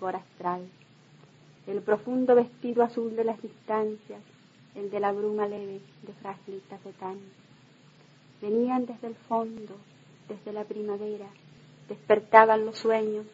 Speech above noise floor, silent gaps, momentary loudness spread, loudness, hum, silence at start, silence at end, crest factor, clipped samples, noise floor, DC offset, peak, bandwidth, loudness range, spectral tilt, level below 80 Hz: 29 dB; none; 22 LU; -27 LUFS; none; 0 s; 0.05 s; 28 dB; under 0.1%; -57 dBFS; under 0.1%; -2 dBFS; 7.8 kHz; 10 LU; -6.5 dB/octave; -80 dBFS